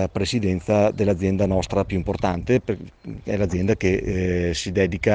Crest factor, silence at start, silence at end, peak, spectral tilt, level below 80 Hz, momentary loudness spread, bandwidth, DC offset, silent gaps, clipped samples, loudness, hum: 18 dB; 0 s; 0 s; -4 dBFS; -6.5 dB/octave; -40 dBFS; 6 LU; 9.6 kHz; under 0.1%; none; under 0.1%; -22 LUFS; none